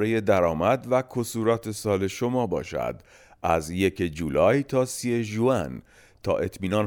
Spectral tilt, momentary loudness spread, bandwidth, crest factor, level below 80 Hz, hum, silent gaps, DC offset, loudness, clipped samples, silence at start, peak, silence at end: -6 dB/octave; 9 LU; over 20 kHz; 18 dB; -50 dBFS; none; none; under 0.1%; -25 LUFS; under 0.1%; 0 s; -8 dBFS; 0 s